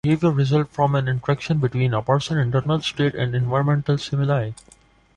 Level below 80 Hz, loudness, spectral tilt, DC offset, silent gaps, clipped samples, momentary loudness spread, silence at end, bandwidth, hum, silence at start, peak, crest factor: -50 dBFS; -21 LUFS; -7 dB/octave; under 0.1%; none; under 0.1%; 4 LU; 0.65 s; 9.8 kHz; none; 0.05 s; -6 dBFS; 16 dB